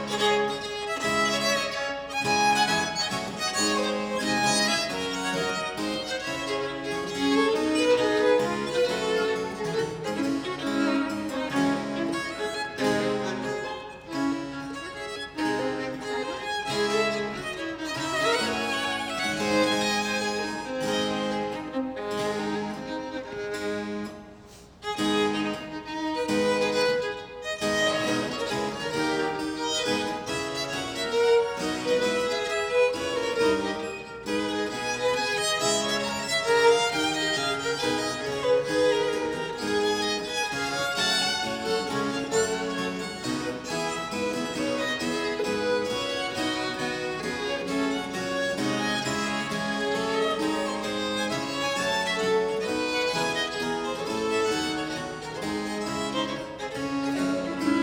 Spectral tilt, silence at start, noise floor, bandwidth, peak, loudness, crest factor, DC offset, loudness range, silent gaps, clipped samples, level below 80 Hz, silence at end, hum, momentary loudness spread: -3 dB/octave; 0 s; -48 dBFS; 19.5 kHz; -8 dBFS; -27 LUFS; 20 dB; under 0.1%; 5 LU; none; under 0.1%; -58 dBFS; 0 s; none; 8 LU